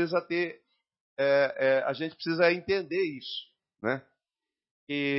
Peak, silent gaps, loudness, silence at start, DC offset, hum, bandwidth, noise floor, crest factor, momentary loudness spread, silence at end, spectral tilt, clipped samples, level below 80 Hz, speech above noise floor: -10 dBFS; 1.01-1.16 s, 4.71-4.87 s; -29 LUFS; 0 s; under 0.1%; none; 5.8 kHz; under -90 dBFS; 18 dB; 11 LU; 0 s; -8.5 dB/octave; under 0.1%; -70 dBFS; over 62 dB